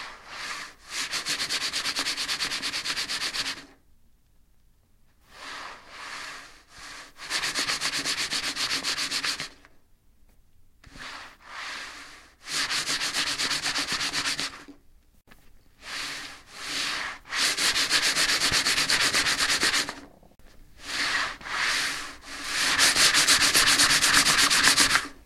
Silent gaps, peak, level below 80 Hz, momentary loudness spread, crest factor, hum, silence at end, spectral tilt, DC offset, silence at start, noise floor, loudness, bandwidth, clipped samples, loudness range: none; -2 dBFS; -54 dBFS; 22 LU; 26 dB; none; 0.1 s; 0.5 dB/octave; under 0.1%; 0 s; -60 dBFS; -23 LUFS; 16.5 kHz; under 0.1%; 14 LU